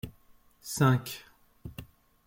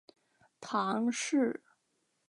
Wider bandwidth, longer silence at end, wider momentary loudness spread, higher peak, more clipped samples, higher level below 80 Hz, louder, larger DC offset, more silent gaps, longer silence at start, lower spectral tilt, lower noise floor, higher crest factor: first, 16.5 kHz vs 11.5 kHz; second, 0.45 s vs 0.7 s; first, 22 LU vs 13 LU; first, -10 dBFS vs -18 dBFS; neither; first, -58 dBFS vs -88 dBFS; first, -28 LUFS vs -32 LUFS; neither; neither; second, 0.05 s vs 0.6 s; first, -5.5 dB/octave vs -4 dB/octave; second, -60 dBFS vs -78 dBFS; about the same, 22 dB vs 18 dB